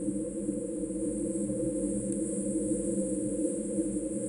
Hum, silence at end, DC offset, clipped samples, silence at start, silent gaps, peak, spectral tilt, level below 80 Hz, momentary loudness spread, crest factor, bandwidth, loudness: none; 0 s; under 0.1%; under 0.1%; 0 s; none; -18 dBFS; -7 dB/octave; -52 dBFS; 3 LU; 14 dB; 11 kHz; -32 LUFS